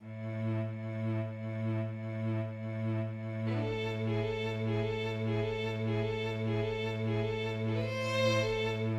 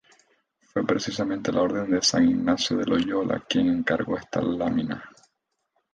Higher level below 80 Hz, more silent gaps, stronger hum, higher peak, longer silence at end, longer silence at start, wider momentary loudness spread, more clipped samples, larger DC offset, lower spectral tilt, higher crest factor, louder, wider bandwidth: about the same, -56 dBFS vs -56 dBFS; neither; neither; second, -18 dBFS vs -8 dBFS; second, 0 s vs 0.85 s; second, 0 s vs 0.75 s; about the same, 6 LU vs 7 LU; neither; neither; first, -7 dB/octave vs -4.5 dB/octave; about the same, 16 dB vs 16 dB; second, -34 LUFS vs -25 LUFS; second, 8.2 kHz vs 9.4 kHz